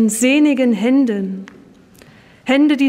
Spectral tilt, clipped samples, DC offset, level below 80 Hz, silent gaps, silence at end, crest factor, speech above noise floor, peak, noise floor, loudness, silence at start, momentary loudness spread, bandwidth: -4.5 dB/octave; under 0.1%; under 0.1%; -60 dBFS; none; 0 s; 12 dB; 31 dB; -4 dBFS; -45 dBFS; -15 LUFS; 0 s; 14 LU; 16 kHz